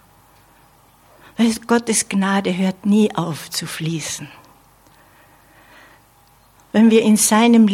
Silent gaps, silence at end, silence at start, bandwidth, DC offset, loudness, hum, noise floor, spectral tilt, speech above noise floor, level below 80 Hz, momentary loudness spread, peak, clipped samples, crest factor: none; 0 s; 1.4 s; 16 kHz; under 0.1%; -17 LUFS; none; -53 dBFS; -4.5 dB/octave; 37 dB; -60 dBFS; 13 LU; -2 dBFS; under 0.1%; 16 dB